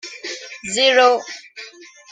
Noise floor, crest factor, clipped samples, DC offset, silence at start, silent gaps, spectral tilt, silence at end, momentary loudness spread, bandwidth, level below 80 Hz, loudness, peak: -41 dBFS; 18 dB; under 0.1%; under 0.1%; 0.05 s; none; -0.5 dB/octave; 0.3 s; 23 LU; 9.6 kHz; -66 dBFS; -15 LUFS; -2 dBFS